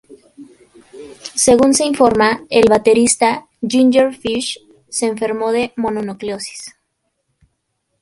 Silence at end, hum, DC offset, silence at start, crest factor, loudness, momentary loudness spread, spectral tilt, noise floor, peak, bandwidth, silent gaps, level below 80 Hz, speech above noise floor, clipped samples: 1.35 s; none; under 0.1%; 0.1 s; 16 dB; -15 LUFS; 14 LU; -3 dB/octave; -70 dBFS; 0 dBFS; 11.5 kHz; none; -50 dBFS; 56 dB; under 0.1%